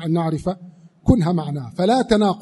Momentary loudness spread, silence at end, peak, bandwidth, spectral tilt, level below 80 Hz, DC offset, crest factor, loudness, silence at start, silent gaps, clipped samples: 11 LU; 0 s; 0 dBFS; 11.5 kHz; -7.5 dB/octave; -38 dBFS; under 0.1%; 18 dB; -20 LUFS; 0 s; none; under 0.1%